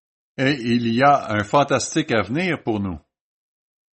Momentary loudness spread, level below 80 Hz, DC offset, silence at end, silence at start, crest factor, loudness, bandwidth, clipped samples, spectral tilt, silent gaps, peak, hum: 10 LU; -56 dBFS; under 0.1%; 0.95 s; 0.4 s; 18 dB; -20 LUFS; 8.8 kHz; under 0.1%; -5 dB/octave; none; -4 dBFS; none